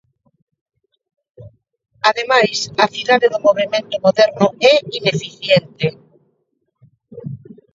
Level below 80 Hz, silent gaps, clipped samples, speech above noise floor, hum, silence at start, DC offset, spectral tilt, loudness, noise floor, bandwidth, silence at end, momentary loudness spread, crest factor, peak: -60 dBFS; none; under 0.1%; 53 dB; none; 1.4 s; under 0.1%; -4 dB/octave; -15 LUFS; -69 dBFS; 8 kHz; 0.4 s; 14 LU; 18 dB; 0 dBFS